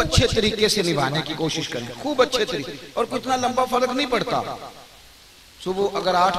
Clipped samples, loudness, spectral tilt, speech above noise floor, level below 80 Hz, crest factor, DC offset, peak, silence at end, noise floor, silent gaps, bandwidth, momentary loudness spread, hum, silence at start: under 0.1%; -22 LUFS; -4 dB/octave; 26 dB; -40 dBFS; 20 dB; under 0.1%; -2 dBFS; 0 s; -48 dBFS; none; 15.5 kHz; 10 LU; none; 0 s